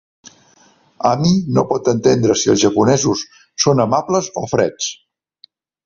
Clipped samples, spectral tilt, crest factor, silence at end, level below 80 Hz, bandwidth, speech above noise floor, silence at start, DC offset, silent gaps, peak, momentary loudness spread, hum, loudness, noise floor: under 0.1%; -5 dB/octave; 16 dB; 0.9 s; -50 dBFS; 7.6 kHz; 37 dB; 0.25 s; under 0.1%; none; -2 dBFS; 7 LU; none; -16 LUFS; -53 dBFS